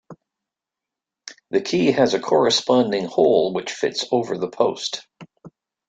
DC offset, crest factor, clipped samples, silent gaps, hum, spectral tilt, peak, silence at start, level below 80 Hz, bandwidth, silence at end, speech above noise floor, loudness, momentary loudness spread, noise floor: under 0.1%; 20 dB; under 0.1%; none; none; -4.5 dB/octave; -2 dBFS; 0.1 s; -64 dBFS; 9.2 kHz; 0.4 s; 67 dB; -20 LUFS; 11 LU; -87 dBFS